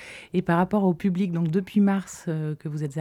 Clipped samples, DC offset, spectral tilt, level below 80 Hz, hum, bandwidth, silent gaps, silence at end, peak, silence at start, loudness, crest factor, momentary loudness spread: under 0.1%; under 0.1%; -7.5 dB/octave; -60 dBFS; none; 12.5 kHz; none; 0 s; -10 dBFS; 0 s; -25 LUFS; 16 dB; 9 LU